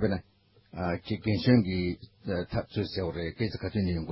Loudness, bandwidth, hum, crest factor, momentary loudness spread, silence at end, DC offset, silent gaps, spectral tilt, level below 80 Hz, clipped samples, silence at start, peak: -30 LUFS; 5.8 kHz; none; 20 dB; 11 LU; 0 s; under 0.1%; none; -11 dB/octave; -46 dBFS; under 0.1%; 0 s; -10 dBFS